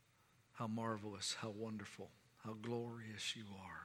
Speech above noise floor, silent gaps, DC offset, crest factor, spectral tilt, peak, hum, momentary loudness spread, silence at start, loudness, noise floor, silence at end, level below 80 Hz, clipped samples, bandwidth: 27 dB; none; under 0.1%; 18 dB; -4 dB/octave; -30 dBFS; none; 12 LU; 0.55 s; -46 LUFS; -74 dBFS; 0 s; -84 dBFS; under 0.1%; 16.5 kHz